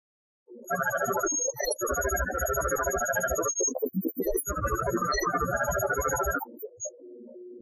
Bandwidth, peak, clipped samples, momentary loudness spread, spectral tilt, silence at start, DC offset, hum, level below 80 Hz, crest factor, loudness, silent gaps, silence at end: 14.5 kHz; -14 dBFS; under 0.1%; 12 LU; -3.5 dB/octave; 0.5 s; under 0.1%; none; -42 dBFS; 16 dB; -28 LUFS; none; 0 s